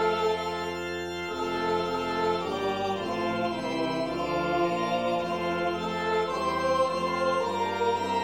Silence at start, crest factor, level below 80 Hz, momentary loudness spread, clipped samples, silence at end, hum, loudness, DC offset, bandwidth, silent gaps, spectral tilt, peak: 0 s; 14 dB; -58 dBFS; 4 LU; under 0.1%; 0 s; none; -28 LUFS; 0.1%; 16 kHz; none; -5 dB/octave; -14 dBFS